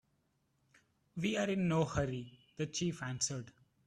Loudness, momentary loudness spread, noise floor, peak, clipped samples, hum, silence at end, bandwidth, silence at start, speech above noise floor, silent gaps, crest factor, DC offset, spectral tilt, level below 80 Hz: -37 LUFS; 14 LU; -78 dBFS; -20 dBFS; under 0.1%; none; 0.35 s; 12 kHz; 1.15 s; 42 dB; none; 18 dB; under 0.1%; -4.5 dB/octave; -62 dBFS